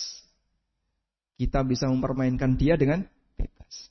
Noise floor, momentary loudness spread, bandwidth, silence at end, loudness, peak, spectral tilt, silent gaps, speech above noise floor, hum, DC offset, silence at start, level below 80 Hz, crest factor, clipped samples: -81 dBFS; 17 LU; 6.2 kHz; 0.05 s; -26 LUFS; -10 dBFS; -6.5 dB/octave; none; 57 dB; none; under 0.1%; 0 s; -38 dBFS; 18 dB; under 0.1%